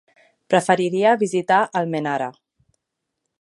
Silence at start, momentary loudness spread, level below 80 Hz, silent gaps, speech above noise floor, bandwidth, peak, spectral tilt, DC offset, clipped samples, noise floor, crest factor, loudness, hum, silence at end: 0.5 s; 7 LU; -72 dBFS; none; 61 dB; 11.5 kHz; -2 dBFS; -5 dB/octave; under 0.1%; under 0.1%; -80 dBFS; 20 dB; -20 LUFS; none; 1.1 s